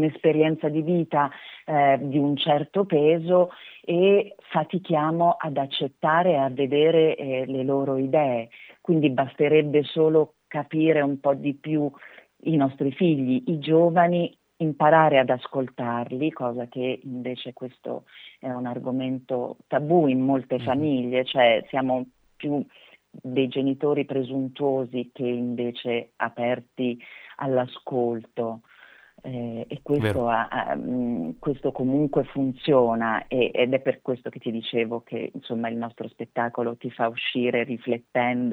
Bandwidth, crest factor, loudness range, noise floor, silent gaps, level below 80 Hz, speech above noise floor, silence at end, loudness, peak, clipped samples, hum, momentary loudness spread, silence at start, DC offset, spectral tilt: 4.5 kHz; 20 dB; 7 LU; -52 dBFS; none; -62 dBFS; 29 dB; 0 s; -24 LUFS; -4 dBFS; under 0.1%; none; 12 LU; 0 s; under 0.1%; -8.5 dB/octave